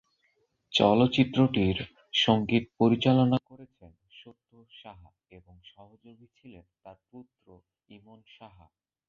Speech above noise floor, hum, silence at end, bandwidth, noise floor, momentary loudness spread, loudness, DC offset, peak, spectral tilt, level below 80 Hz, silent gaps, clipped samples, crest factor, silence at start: 45 dB; none; 0.65 s; 7.2 kHz; -73 dBFS; 9 LU; -25 LUFS; under 0.1%; -8 dBFS; -6.5 dB/octave; -56 dBFS; none; under 0.1%; 22 dB; 0.7 s